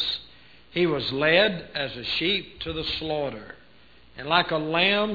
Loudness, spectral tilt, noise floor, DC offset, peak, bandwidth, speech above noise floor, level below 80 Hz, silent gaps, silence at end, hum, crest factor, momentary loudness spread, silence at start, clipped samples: -24 LUFS; -6.5 dB/octave; -55 dBFS; 0.2%; -4 dBFS; 5 kHz; 30 dB; -52 dBFS; none; 0 s; none; 22 dB; 13 LU; 0 s; under 0.1%